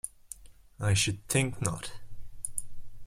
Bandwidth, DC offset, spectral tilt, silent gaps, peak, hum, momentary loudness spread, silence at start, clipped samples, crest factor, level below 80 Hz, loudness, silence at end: 16.5 kHz; under 0.1%; -3.5 dB/octave; none; -8 dBFS; none; 20 LU; 0.05 s; under 0.1%; 24 dB; -50 dBFS; -31 LUFS; 0 s